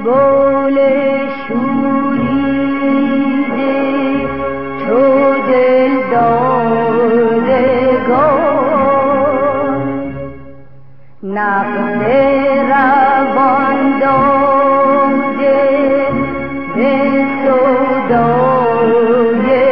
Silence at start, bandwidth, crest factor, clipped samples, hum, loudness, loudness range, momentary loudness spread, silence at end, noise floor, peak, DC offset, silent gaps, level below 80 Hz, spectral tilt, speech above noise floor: 0 s; 5.4 kHz; 10 dB; under 0.1%; none; -12 LUFS; 4 LU; 7 LU; 0 s; -43 dBFS; -2 dBFS; 2%; none; -44 dBFS; -12 dB/octave; 32 dB